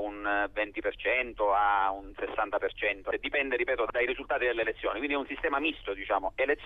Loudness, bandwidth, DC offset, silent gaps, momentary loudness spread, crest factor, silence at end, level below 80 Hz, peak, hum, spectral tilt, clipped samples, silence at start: -30 LUFS; 4.8 kHz; under 0.1%; none; 6 LU; 16 dB; 0 s; -52 dBFS; -14 dBFS; none; -6 dB/octave; under 0.1%; 0 s